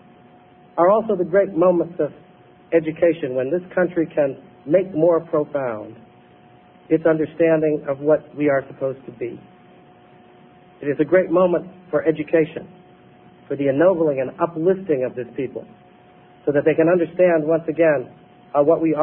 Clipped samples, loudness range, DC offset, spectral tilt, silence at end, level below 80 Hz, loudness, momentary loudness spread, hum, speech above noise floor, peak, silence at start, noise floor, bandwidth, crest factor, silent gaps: under 0.1%; 3 LU; under 0.1%; -12 dB/octave; 0 s; -62 dBFS; -20 LUFS; 12 LU; none; 30 dB; -4 dBFS; 0.75 s; -49 dBFS; 3.7 kHz; 16 dB; none